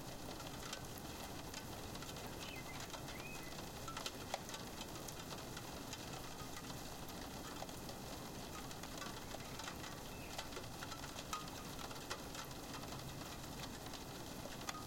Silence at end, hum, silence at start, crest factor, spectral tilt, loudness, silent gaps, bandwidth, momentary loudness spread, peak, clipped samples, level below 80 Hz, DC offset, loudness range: 0 s; none; 0 s; 24 dB; -3.5 dB/octave; -48 LUFS; none; 17 kHz; 3 LU; -24 dBFS; under 0.1%; -60 dBFS; under 0.1%; 1 LU